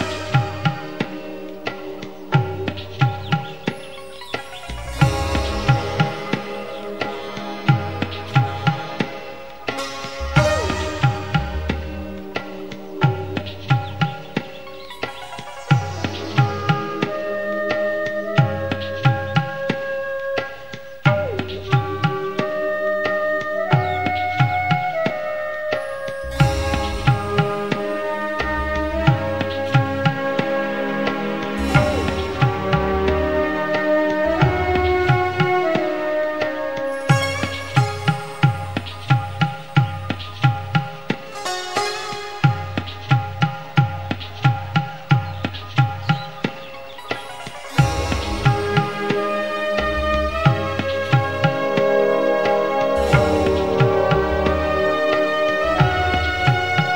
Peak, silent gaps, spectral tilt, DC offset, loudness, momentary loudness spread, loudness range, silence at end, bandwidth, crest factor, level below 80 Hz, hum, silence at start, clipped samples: -2 dBFS; none; -6.5 dB/octave; 1%; -21 LUFS; 11 LU; 5 LU; 0 s; 16 kHz; 20 dB; -36 dBFS; none; 0 s; under 0.1%